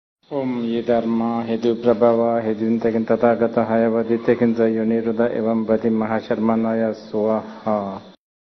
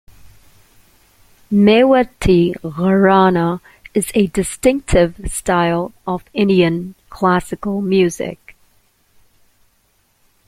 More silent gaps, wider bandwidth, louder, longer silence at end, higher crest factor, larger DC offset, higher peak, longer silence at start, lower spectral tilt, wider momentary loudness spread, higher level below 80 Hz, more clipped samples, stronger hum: neither; second, 6.2 kHz vs 15.5 kHz; second, -20 LUFS vs -16 LUFS; second, 0.45 s vs 2.15 s; about the same, 16 dB vs 16 dB; neither; about the same, -2 dBFS vs -2 dBFS; about the same, 0.3 s vs 0.25 s; first, -8.5 dB/octave vs -6 dB/octave; second, 7 LU vs 12 LU; second, -58 dBFS vs -36 dBFS; neither; neither